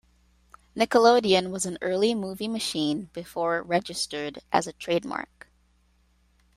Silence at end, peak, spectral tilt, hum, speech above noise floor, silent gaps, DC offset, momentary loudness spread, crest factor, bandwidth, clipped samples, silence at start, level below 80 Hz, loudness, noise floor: 1.3 s; -4 dBFS; -4 dB/octave; none; 39 dB; none; under 0.1%; 15 LU; 22 dB; 15.5 kHz; under 0.1%; 0.75 s; -62 dBFS; -26 LUFS; -64 dBFS